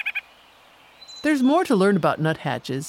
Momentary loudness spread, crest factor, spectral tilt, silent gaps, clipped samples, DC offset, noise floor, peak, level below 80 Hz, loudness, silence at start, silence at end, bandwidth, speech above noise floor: 10 LU; 16 dB; -6 dB/octave; none; under 0.1%; under 0.1%; -52 dBFS; -6 dBFS; -64 dBFS; -21 LUFS; 0.05 s; 0 s; 16 kHz; 32 dB